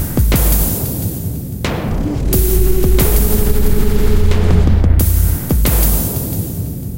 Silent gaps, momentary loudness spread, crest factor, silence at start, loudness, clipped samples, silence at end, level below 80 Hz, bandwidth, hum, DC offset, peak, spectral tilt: none; 8 LU; 12 dB; 0 s; -15 LUFS; under 0.1%; 0 s; -16 dBFS; 17 kHz; none; under 0.1%; 0 dBFS; -5.5 dB/octave